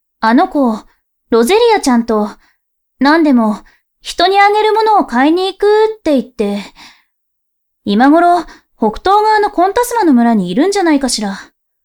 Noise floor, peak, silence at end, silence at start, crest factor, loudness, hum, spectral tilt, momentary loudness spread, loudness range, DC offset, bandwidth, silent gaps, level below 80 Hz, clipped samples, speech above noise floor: -69 dBFS; 0 dBFS; 0.4 s; 0.2 s; 12 dB; -12 LUFS; none; -4.5 dB/octave; 13 LU; 3 LU; under 0.1%; 20 kHz; none; -44 dBFS; under 0.1%; 58 dB